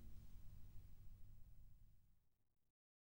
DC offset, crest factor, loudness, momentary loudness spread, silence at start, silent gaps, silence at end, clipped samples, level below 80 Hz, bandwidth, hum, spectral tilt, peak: under 0.1%; 14 dB; -66 LUFS; 4 LU; 0 s; none; 0.5 s; under 0.1%; -64 dBFS; 19.5 kHz; none; -6.5 dB/octave; -46 dBFS